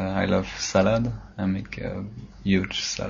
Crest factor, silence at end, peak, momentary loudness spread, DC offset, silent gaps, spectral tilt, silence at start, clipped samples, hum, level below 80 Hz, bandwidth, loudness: 20 dB; 0 s; -4 dBFS; 11 LU; under 0.1%; none; -5 dB/octave; 0 s; under 0.1%; none; -44 dBFS; 7.6 kHz; -26 LUFS